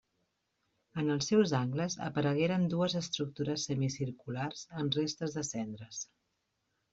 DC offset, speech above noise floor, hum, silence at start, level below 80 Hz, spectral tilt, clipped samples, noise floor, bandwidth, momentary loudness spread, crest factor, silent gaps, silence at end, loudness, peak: under 0.1%; 48 dB; none; 0.95 s; -70 dBFS; -5 dB/octave; under 0.1%; -81 dBFS; 8 kHz; 12 LU; 18 dB; none; 0.9 s; -34 LUFS; -16 dBFS